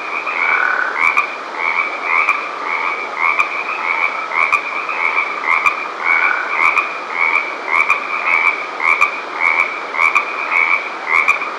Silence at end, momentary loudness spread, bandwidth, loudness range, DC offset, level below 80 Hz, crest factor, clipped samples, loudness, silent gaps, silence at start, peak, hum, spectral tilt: 0 s; 5 LU; 15 kHz; 2 LU; under 0.1%; -66 dBFS; 16 dB; under 0.1%; -15 LUFS; none; 0 s; 0 dBFS; none; -1 dB/octave